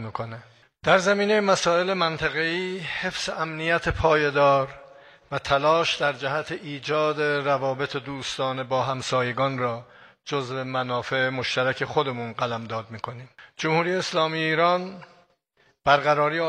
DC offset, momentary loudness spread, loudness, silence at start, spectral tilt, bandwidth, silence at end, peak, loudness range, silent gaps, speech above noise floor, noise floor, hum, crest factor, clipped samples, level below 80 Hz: under 0.1%; 13 LU; -24 LUFS; 0 s; -4.5 dB/octave; 11 kHz; 0 s; -4 dBFS; 4 LU; none; 41 dB; -65 dBFS; none; 22 dB; under 0.1%; -52 dBFS